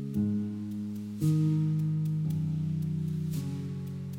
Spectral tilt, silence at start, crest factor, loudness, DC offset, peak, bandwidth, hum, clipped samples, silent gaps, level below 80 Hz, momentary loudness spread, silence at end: -9 dB/octave; 0 s; 14 dB; -31 LUFS; under 0.1%; -18 dBFS; 15.5 kHz; none; under 0.1%; none; -62 dBFS; 9 LU; 0 s